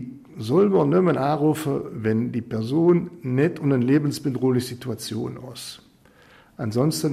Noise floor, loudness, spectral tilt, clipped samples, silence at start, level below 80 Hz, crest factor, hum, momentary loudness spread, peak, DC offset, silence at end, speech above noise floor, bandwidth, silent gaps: -53 dBFS; -22 LUFS; -7 dB/octave; under 0.1%; 0 s; -60 dBFS; 14 dB; none; 14 LU; -8 dBFS; under 0.1%; 0 s; 31 dB; 15.5 kHz; none